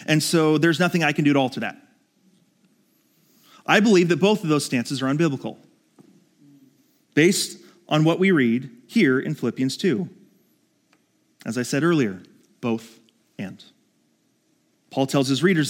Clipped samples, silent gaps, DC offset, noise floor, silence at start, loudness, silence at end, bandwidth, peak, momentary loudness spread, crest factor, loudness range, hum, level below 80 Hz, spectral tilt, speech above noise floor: under 0.1%; none; under 0.1%; -66 dBFS; 0 s; -21 LUFS; 0 s; 17 kHz; 0 dBFS; 15 LU; 22 dB; 6 LU; none; -76 dBFS; -5 dB/octave; 45 dB